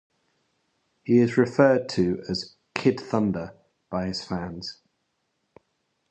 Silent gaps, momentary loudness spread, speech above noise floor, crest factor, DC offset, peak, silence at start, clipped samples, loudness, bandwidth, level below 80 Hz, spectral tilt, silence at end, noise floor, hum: none; 15 LU; 52 dB; 22 dB; under 0.1%; -4 dBFS; 1.05 s; under 0.1%; -25 LUFS; 8.8 kHz; -56 dBFS; -6.5 dB/octave; 1.35 s; -75 dBFS; none